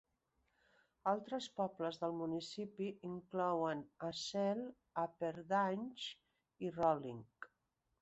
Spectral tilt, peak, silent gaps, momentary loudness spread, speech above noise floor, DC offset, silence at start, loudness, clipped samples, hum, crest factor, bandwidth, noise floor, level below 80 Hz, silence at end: -4 dB/octave; -20 dBFS; none; 12 LU; 45 dB; under 0.1%; 1.05 s; -41 LUFS; under 0.1%; none; 22 dB; 8 kHz; -85 dBFS; -80 dBFS; 0.55 s